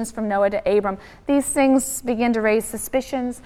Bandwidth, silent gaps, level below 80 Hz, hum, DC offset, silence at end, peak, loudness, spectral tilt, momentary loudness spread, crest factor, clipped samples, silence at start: 16 kHz; none; -48 dBFS; none; under 0.1%; 0.05 s; -6 dBFS; -21 LUFS; -4 dB/octave; 7 LU; 14 dB; under 0.1%; 0 s